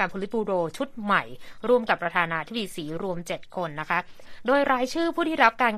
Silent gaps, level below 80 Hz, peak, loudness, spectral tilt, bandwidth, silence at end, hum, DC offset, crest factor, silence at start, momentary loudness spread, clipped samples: none; -54 dBFS; -4 dBFS; -26 LUFS; -5 dB/octave; 14.5 kHz; 0 s; none; under 0.1%; 22 dB; 0 s; 11 LU; under 0.1%